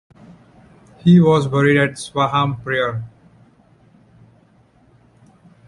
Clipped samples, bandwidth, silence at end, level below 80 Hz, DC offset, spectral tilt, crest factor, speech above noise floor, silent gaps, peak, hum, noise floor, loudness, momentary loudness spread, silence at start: under 0.1%; 11.5 kHz; 2.6 s; -54 dBFS; under 0.1%; -7 dB/octave; 18 dB; 38 dB; none; -2 dBFS; none; -54 dBFS; -16 LUFS; 11 LU; 1.05 s